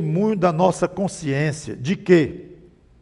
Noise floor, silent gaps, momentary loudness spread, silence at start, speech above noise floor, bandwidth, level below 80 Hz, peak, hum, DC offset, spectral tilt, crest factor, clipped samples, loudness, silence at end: -48 dBFS; none; 10 LU; 0 s; 28 dB; 11.5 kHz; -52 dBFS; -2 dBFS; none; under 0.1%; -6.5 dB/octave; 18 dB; under 0.1%; -20 LUFS; 0.5 s